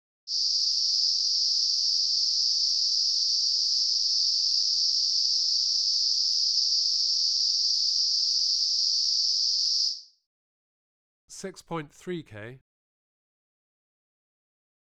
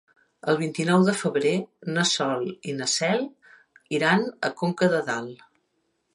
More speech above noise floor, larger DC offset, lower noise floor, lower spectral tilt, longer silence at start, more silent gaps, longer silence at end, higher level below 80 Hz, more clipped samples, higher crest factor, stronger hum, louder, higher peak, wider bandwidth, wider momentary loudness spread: first, over 53 dB vs 49 dB; first, 0.1% vs under 0.1%; first, under -90 dBFS vs -73 dBFS; second, 0.5 dB/octave vs -4.5 dB/octave; second, 0.25 s vs 0.45 s; first, 10.26-11.28 s vs none; first, 2.25 s vs 0.8 s; about the same, -74 dBFS vs -72 dBFS; neither; about the same, 16 dB vs 20 dB; first, 50 Hz at -105 dBFS vs none; about the same, -22 LUFS vs -24 LUFS; second, -12 dBFS vs -6 dBFS; about the same, 12.5 kHz vs 11.5 kHz; first, 14 LU vs 10 LU